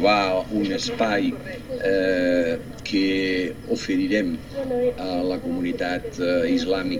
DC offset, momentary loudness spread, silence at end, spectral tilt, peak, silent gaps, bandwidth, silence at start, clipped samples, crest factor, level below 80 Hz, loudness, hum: 0.4%; 7 LU; 0 s; -5 dB/octave; -6 dBFS; none; 16 kHz; 0 s; under 0.1%; 16 dB; -46 dBFS; -23 LUFS; none